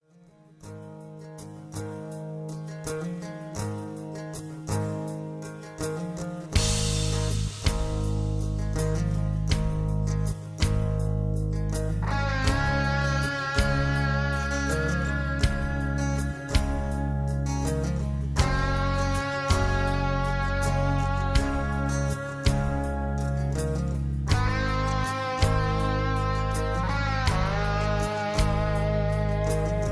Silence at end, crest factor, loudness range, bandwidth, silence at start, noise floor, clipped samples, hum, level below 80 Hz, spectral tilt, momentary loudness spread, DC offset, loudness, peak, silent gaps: 0 s; 20 dB; 8 LU; 11 kHz; 0.6 s; -56 dBFS; under 0.1%; none; -32 dBFS; -5.5 dB/octave; 11 LU; under 0.1%; -27 LUFS; -6 dBFS; none